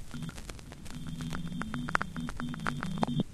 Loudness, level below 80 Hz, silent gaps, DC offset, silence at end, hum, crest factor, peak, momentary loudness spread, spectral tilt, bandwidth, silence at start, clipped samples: -37 LUFS; -48 dBFS; none; under 0.1%; 0 s; none; 28 dB; -6 dBFS; 12 LU; -5.5 dB/octave; 14 kHz; 0 s; under 0.1%